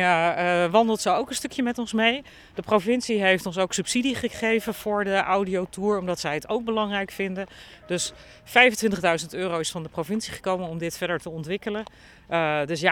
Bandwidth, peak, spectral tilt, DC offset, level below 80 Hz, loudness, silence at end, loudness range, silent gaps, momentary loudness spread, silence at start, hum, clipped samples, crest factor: 18.5 kHz; -2 dBFS; -4 dB/octave; under 0.1%; -56 dBFS; -24 LUFS; 0 s; 4 LU; none; 10 LU; 0 s; none; under 0.1%; 22 dB